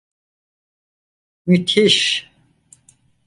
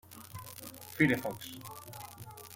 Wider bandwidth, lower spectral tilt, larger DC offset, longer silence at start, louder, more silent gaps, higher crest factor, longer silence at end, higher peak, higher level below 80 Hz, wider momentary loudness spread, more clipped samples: second, 11.5 kHz vs 17 kHz; about the same, -4 dB/octave vs -5 dB/octave; neither; first, 1.45 s vs 0.05 s; first, -15 LUFS vs -33 LUFS; neither; about the same, 20 dB vs 24 dB; first, 1.05 s vs 0 s; first, -2 dBFS vs -12 dBFS; first, -62 dBFS vs -68 dBFS; second, 10 LU vs 19 LU; neither